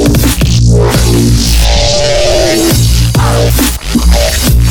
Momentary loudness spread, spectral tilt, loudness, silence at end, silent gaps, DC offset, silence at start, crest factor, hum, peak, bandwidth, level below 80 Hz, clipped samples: 2 LU; -4.5 dB/octave; -8 LUFS; 0 s; none; under 0.1%; 0 s; 8 dB; none; 0 dBFS; over 20 kHz; -12 dBFS; under 0.1%